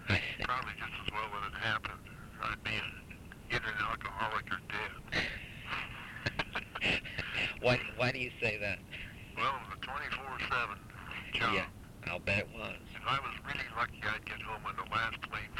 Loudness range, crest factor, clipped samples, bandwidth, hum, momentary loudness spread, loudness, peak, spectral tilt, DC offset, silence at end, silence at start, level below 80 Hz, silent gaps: 3 LU; 22 dB; under 0.1%; 17 kHz; none; 11 LU; -36 LUFS; -16 dBFS; -4.5 dB/octave; under 0.1%; 0 s; 0 s; -54 dBFS; none